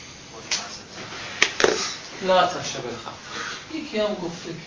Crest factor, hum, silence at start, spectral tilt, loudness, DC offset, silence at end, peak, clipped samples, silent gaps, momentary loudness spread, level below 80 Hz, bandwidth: 26 dB; none; 0 s; -2.5 dB/octave; -25 LUFS; under 0.1%; 0 s; 0 dBFS; under 0.1%; none; 15 LU; -58 dBFS; 7.6 kHz